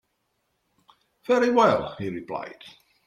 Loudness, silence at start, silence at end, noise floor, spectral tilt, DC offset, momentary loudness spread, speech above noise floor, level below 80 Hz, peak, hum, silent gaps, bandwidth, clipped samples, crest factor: -24 LUFS; 1.3 s; 0.35 s; -75 dBFS; -5.5 dB/octave; under 0.1%; 19 LU; 51 dB; -64 dBFS; -4 dBFS; none; none; 12 kHz; under 0.1%; 22 dB